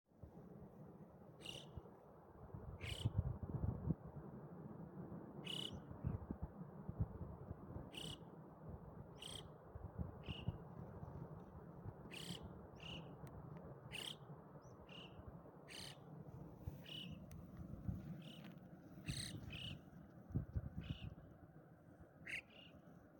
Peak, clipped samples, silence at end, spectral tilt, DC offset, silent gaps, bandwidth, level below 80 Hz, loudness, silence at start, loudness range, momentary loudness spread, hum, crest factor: -26 dBFS; under 0.1%; 0 s; -5.5 dB/octave; under 0.1%; none; 17 kHz; -62 dBFS; -52 LUFS; 0.1 s; 6 LU; 14 LU; none; 24 dB